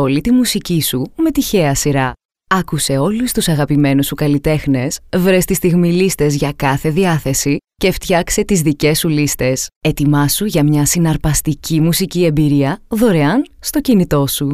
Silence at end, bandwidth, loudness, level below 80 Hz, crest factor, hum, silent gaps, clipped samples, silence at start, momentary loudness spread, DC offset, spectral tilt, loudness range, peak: 0 s; 16 kHz; -14 LUFS; -34 dBFS; 14 dB; none; 2.25-2.29 s, 9.76-9.81 s; under 0.1%; 0 s; 5 LU; 0.6%; -5 dB/octave; 1 LU; 0 dBFS